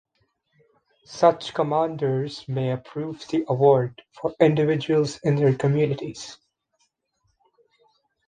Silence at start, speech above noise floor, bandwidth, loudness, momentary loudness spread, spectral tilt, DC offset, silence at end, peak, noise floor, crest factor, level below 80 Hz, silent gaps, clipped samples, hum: 1.1 s; 50 dB; 9.6 kHz; -23 LUFS; 13 LU; -7 dB/octave; under 0.1%; 1.95 s; -4 dBFS; -72 dBFS; 20 dB; -62 dBFS; none; under 0.1%; none